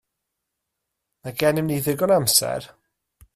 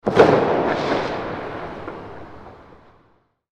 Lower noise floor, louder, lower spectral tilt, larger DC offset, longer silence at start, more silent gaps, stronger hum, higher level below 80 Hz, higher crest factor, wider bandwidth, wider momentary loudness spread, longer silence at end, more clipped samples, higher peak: first, -81 dBFS vs -60 dBFS; about the same, -20 LUFS vs -20 LUFS; second, -3.5 dB/octave vs -6.5 dB/octave; neither; first, 1.25 s vs 0.05 s; neither; neither; second, -58 dBFS vs -48 dBFS; about the same, 20 dB vs 20 dB; first, 16 kHz vs 10 kHz; second, 15 LU vs 24 LU; second, 0.7 s vs 1 s; neither; second, -4 dBFS vs 0 dBFS